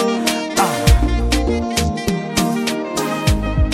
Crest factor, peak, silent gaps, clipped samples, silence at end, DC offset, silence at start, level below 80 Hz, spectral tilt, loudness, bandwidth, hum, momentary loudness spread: 16 dB; -2 dBFS; none; under 0.1%; 0 s; under 0.1%; 0 s; -22 dBFS; -5 dB/octave; -18 LUFS; 16.5 kHz; none; 5 LU